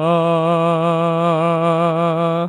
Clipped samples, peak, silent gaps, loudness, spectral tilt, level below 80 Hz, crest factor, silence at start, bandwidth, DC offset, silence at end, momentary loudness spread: under 0.1%; -4 dBFS; none; -16 LUFS; -8 dB/octave; -72 dBFS; 12 dB; 0 s; 9.8 kHz; under 0.1%; 0 s; 1 LU